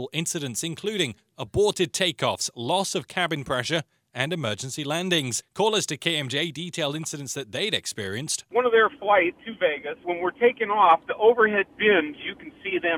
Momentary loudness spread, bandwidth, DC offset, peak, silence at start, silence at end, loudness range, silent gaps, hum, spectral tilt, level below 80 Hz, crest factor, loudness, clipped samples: 11 LU; 17.5 kHz; under 0.1%; -4 dBFS; 0 s; 0 s; 5 LU; none; none; -3 dB/octave; -58 dBFS; 20 dB; -24 LUFS; under 0.1%